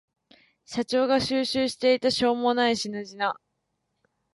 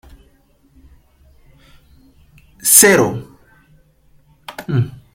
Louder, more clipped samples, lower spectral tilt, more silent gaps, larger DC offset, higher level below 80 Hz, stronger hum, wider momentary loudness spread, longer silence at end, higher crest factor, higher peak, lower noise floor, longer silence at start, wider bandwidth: second, -25 LUFS vs -12 LUFS; neither; about the same, -3.5 dB/octave vs -3 dB/octave; neither; neither; second, -62 dBFS vs -50 dBFS; neither; second, 10 LU vs 24 LU; first, 0.95 s vs 0.2 s; about the same, 16 dB vs 20 dB; second, -10 dBFS vs 0 dBFS; first, -78 dBFS vs -54 dBFS; second, 0.7 s vs 2.65 s; second, 11.5 kHz vs 16.5 kHz